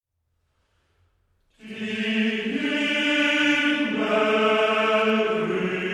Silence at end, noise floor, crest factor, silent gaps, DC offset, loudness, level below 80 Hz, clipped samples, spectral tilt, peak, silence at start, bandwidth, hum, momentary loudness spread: 0 s; -73 dBFS; 14 dB; none; under 0.1%; -22 LUFS; -66 dBFS; under 0.1%; -4.5 dB/octave; -10 dBFS; 1.65 s; 12 kHz; none; 6 LU